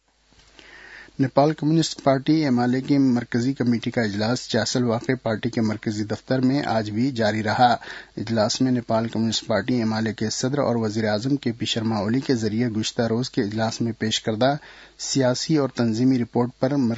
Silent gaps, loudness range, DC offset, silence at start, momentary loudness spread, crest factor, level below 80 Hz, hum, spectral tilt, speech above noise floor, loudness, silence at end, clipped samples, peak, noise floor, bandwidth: none; 2 LU; under 0.1%; 0.7 s; 5 LU; 20 dB; -58 dBFS; none; -5.5 dB/octave; 35 dB; -23 LUFS; 0 s; under 0.1%; -2 dBFS; -57 dBFS; 8 kHz